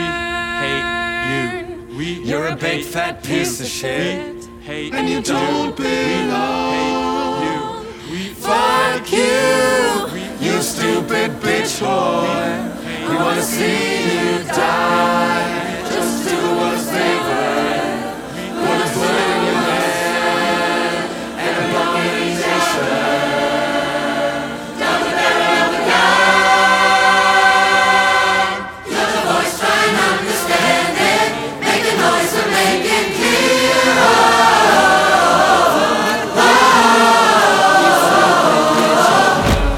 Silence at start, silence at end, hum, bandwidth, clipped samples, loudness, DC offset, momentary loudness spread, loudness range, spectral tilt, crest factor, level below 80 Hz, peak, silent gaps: 0 s; 0 s; none; 19 kHz; under 0.1%; -15 LUFS; under 0.1%; 11 LU; 9 LU; -3 dB/octave; 16 dB; -38 dBFS; 0 dBFS; none